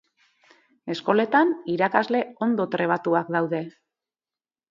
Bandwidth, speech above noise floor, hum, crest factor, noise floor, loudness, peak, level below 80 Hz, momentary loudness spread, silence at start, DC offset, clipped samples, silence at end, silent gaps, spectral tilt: 7.4 kHz; over 67 dB; none; 22 dB; under -90 dBFS; -23 LUFS; -2 dBFS; -74 dBFS; 10 LU; 0.85 s; under 0.1%; under 0.1%; 1 s; none; -7 dB/octave